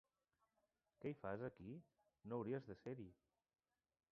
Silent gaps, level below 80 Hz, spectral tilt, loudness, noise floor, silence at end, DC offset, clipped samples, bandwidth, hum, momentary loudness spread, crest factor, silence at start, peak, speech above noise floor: none; -80 dBFS; -8 dB/octave; -52 LUFS; -89 dBFS; 1 s; under 0.1%; under 0.1%; 5.8 kHz; none; 13 LU; 20 dB; 1 s; -34 dBFS; 38 dB